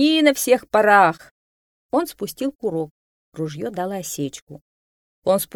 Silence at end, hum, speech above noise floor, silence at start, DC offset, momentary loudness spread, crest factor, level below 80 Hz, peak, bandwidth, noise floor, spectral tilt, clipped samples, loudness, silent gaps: 0.1 s; none; over 70 dB; 0 s; under 0.1%; 15 LU; 20 dB; -62 dBFS; -2 dBFS; 19 kHz; under -90 dBFS; -4 dB/octave; under 0.1%; -20 LUFS; 1.31-1.89 s, 2.55-2.59 s, 2.91-3.32 s, 4.42-4.47 s, 4.61-5.22 s